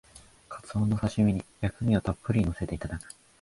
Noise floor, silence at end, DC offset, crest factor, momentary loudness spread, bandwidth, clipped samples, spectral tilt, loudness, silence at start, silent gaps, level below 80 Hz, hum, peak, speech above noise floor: -49 dBFS; 0.35 s; under 0.1%; 18 dB; 15 LU; 11.5 kHz; under 0.1%; -7.5 dB/octave; -29 LUFS; 0.15 s; none; -44 dBFS; none; -10 dBFS; 21 dB